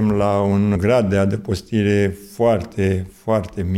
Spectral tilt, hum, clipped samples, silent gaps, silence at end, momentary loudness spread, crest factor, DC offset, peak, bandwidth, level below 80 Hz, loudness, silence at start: -7.5 dB/octave; none; under 0.1%; none; 0 s; 6 LU; 14 dB; 0.1%; -4 dBFS; 15 kHz; -42 dBFS; -19 LUFS; 0 s